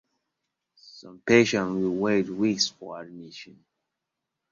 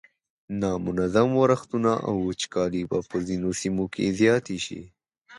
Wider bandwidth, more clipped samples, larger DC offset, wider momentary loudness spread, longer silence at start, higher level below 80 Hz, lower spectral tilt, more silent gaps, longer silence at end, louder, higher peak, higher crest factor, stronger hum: second, 7.6 kHz vs 11.5 kHz; neither; neither; first, 22 LU vs 9 LU; first, 0.95 s vs 0.5 s; second, -66 dBFS vs -52 dBFS; about the same, -4.5 dB/octave vs -5.5 dB/octave; neither; first, 1.05 s vs 0 s; about the same, -24 LUFS vs -25 LUFS; about the same, -6 dBFS vs -6 dBFS; about the same, 22 dB vs 18 dB; neither